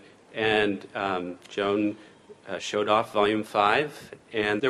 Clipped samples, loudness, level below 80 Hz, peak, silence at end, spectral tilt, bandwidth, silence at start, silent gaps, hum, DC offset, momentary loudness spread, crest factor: under 0.1%; -26 LUFS; -62 dBFS; -6 dBFS; 0 s; -4.5 dB/octave; 12.5 kHz; 0.3 s; none; none; under 0.1%; 12 LU; 20 dB